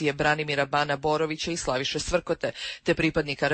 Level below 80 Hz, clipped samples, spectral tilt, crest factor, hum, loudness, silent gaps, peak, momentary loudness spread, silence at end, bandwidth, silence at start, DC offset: -48 dBFS; under 0.1%; -4 dB/octave; 16 dB; none; -26 LUFS; none; -10 dBFS; 5 LU; 0 s; 8.8 kHz; 0 s; under 0.1%